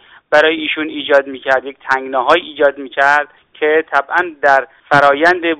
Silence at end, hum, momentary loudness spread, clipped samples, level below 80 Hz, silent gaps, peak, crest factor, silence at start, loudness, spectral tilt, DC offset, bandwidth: 0 s; none; 7 LU; 0.3%; -56 dBFS; none; 0 dBFS; 14 dB; 0.3 s; -14 LUFS; -4.5 dB/octave; under 0.1%; 9.4 kHz